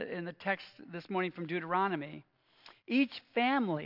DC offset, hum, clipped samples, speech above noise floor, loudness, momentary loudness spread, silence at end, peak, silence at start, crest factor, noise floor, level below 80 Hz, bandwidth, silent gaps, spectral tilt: under 0.1%; none; under 0.1%; 27 dB; -34 LUFS; 16 LU; 0 s; -16 dBFS; 0 s; 18 dB; -61 dBFS; -88 dBFS; 5.8 kHz; none; -8 dB/octave